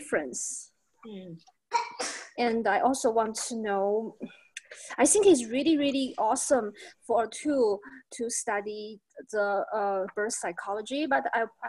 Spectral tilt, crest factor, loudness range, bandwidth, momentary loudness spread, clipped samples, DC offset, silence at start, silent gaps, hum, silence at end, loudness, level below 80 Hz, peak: -2.5 dB/octave; 20 dB; 5 LU; 13 kHz; 19 LU; under 0.1%; under 0.1%; 0 s; none; none; 0 s; -28 LUFS; -68 dBFS; -10 dBFS